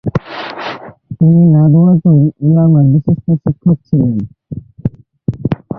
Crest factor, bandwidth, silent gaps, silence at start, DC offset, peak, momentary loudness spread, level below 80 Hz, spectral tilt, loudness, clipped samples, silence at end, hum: 12 dB; 5.2 kHz; none; 0.05 s; under 0.1%; 0 dBFS; 17 LU; -40 dBFS; -11 dB/octave; -11 LUFS; under 0.1%; 0 s; none